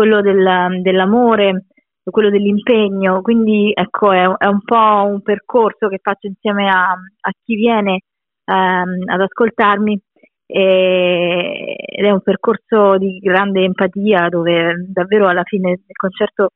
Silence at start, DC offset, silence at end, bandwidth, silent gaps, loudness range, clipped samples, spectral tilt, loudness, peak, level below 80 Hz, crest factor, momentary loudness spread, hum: 0 s; under 0.1%; 0.05 s; 4 kHz; none; 3 LU; under 0.1%; -9.5 dB/octave; -14 LUFS; 0 dBFS; -58 dBFS; 14 dB; 9 LU; none